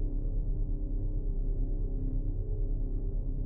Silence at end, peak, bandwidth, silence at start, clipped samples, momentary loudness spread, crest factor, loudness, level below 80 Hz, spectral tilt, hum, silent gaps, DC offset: 0 s; -22 dBFS; 1 kHz; 0 s; under 0.1%; 1 LU; 8 dB; -37 LUFS; -30 dBFS; -15 dB/octave; none; none; 0.1%